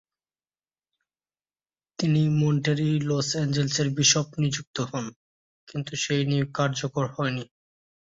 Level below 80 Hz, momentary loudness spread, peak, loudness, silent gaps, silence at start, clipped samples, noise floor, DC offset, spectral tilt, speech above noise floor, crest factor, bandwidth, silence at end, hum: -62 dBFS; 14 LU; -8 dBFS; -25 LUFS; 4.67-4.74 s, 5.16-5.67 s; 2 s; under 0.1%; under -90 dBFS; under 0.1%; -4.5 dB/octave; over 65 dB; 20 dB; 7.8 kHz; 0.75 s; none